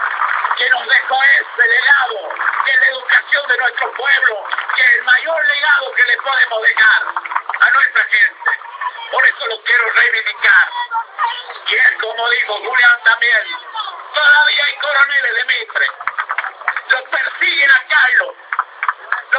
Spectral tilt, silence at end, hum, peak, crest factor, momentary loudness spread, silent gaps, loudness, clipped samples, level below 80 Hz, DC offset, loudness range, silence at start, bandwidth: -0.5 dB/octave; 0 s; none; 0 dBFS; 14 dB; 11 LU; none; -12 LUFS; under 0.1%; -76 dBFS; under 0.1%; 2 LU; 0 s; 4 kHz